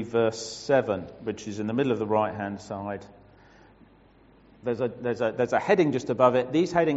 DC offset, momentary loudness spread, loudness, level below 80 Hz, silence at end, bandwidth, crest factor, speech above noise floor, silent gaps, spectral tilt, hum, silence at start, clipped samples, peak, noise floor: under 0.1%; 13 LU; -26 LUFS; -62 dBFS; 0 s; 8 kHz; 20 dB; 31 dB; none; -5 dB/octave; none; 0 s; under 0.1%; -6 dBFS; -56 dBFS